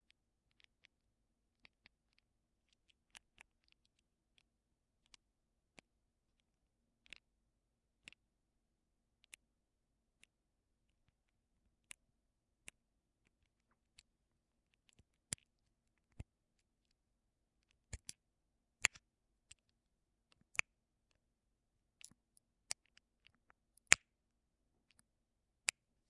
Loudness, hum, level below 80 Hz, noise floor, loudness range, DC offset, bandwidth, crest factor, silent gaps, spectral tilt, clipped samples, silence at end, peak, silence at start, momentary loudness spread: -39 LUFS; none; -74 dBFS; -86 dBFS; 27 LU; under 0.1%; 10.5 kHz; 50 dB; none; 0.5 dB/octave; under 0.1%; 2.15 s; -2 dBFS; 16.2 s; 29 LU